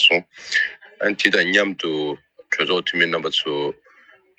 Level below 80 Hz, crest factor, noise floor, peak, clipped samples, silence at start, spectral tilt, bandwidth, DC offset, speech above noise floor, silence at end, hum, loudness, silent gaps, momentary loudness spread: -70 dBFS; 20 dB; -53 dBFS; -2 dBFS; under 0.1%; 0 s; -3 dB/octave; 13 kHz; under 0.1%; 32 dB; 0.65 s; none; -20 LUFS; none; 10 LU